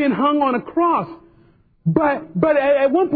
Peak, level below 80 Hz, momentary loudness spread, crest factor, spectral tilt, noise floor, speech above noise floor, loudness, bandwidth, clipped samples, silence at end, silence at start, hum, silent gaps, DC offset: -2 dBFS; -54 dBFS; 6 LU; 16 dB; -11 dB/octave; -53 dBFS; 36 dB; -18 LUFS; 4.8 kHz; under 0.1%; 0 s; 0 s; none; none; under 0.1%